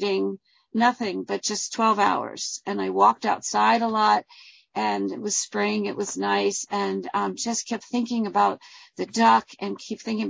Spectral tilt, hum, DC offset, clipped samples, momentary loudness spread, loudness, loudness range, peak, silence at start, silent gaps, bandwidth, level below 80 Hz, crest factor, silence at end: -3 dB/octave; none; under 0.1%; under 0.1%; 11 LU; -24 LUFS; 3 LU; -6 dBFS; 0 s; none; 8 kHz; -72 dBFS; 18 dB; 0 s